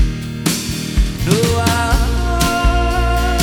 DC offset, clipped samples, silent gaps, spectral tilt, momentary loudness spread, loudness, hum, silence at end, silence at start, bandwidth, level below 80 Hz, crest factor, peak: under 0.1%; under 0.1%; none; -4.5 dB/octave; 5 LU; -16 LUFS; none; 0 s; 0 s; 19 kHz; -18 dBFS; 14 dB; 0 dBFS